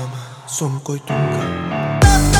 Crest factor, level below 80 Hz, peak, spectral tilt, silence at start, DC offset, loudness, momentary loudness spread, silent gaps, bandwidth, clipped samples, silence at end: 16 dB; -24 dBFS; 0 dBFS; -5 dB/octave; 0 s; under 0.1%; -19 LUFS; 13 LU; none; 19.5 kHz; under 0.1%; 0 s